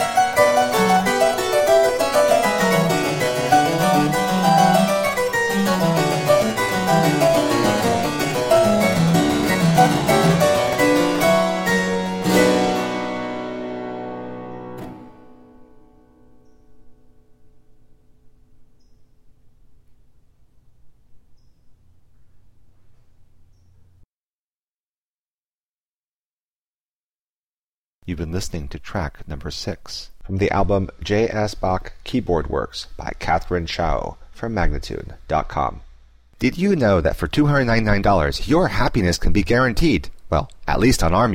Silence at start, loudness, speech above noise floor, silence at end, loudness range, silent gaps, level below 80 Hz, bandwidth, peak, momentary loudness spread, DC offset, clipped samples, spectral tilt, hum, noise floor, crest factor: 0 s; -19 LUFS; over 70 dB; 0 s; 14 LU; 24.05-28.01 s; -34 dBFS; 16.5 kHz; -2 dBFS; 14 LU; under 0.1%; under 0.1%; -5 dB/octave; none; under -90 dBFS; 18 dB